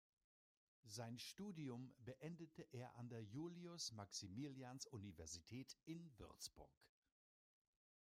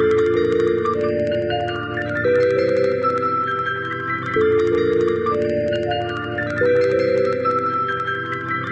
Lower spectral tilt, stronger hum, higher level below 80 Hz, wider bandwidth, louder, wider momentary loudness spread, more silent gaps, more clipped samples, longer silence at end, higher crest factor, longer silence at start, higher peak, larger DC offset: second, -4.5 dB/octave vs -7 dB/octave; neither; second, -80 dBFS vs -50 dBFS; first, 15.5 kHz vs 8.4 kHz; second, -55 LUFS vs -20 LUFS; about the same, 7 LU vs 6 LU; first, 6.77-6.81 s vs none; neither; first, 1.15 s vs 0 s; first, 18 dB vs 12 dB; first, 0.85 s vs 0 s; second, -38 dBFS vs -6 dBFS; neither